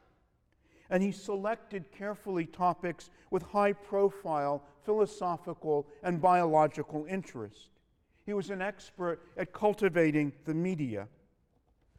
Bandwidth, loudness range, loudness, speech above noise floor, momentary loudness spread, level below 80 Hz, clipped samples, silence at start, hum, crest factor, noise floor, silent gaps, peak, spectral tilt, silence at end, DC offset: 13.5 kHz; 5 LU; -32 LUFS; 39 dB; 13 LU; -66 dBFS; under 0.1%; 0.9 s; none; 20 dB; -71 dBFS; none; -14 dBFS; -7 dB/octave; 0.9 s; under 0.1%